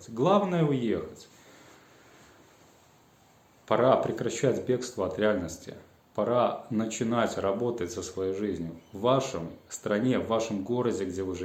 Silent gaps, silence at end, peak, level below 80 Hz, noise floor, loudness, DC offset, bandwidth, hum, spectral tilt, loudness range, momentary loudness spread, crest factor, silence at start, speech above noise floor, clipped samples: none; 0 s; -8 dBFS; -66 dBFS; -60 dBFS; -29 LUFS; under 0.1%; 16.5 kHz; none; -6 dB/octave; 3 LU; 14 LU; 22 dB; 0 s; 32 dB; under 0.1%